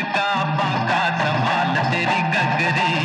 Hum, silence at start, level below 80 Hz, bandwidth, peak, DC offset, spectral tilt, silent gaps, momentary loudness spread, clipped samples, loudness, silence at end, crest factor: none; 0 s; -70 dBFS; 11 kHz; -10 dBFS; under 0.1%; -5.5 dB/octave; none; 2 LU; under 0.1%; -19 LUFS; 0 s; 10 dB